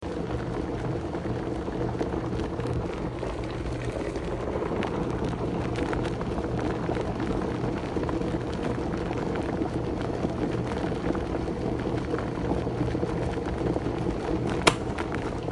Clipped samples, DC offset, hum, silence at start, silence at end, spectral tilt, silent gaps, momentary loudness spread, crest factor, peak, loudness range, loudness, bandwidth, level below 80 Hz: under 0.1%; under 0.1%; none; 0 s; 0 s; -6.5 dB/octave; none; 3 LU; 28 dB; 0 dBFS; 3 LU; -30 LUFS; 11.5 kHz; -40 dBFS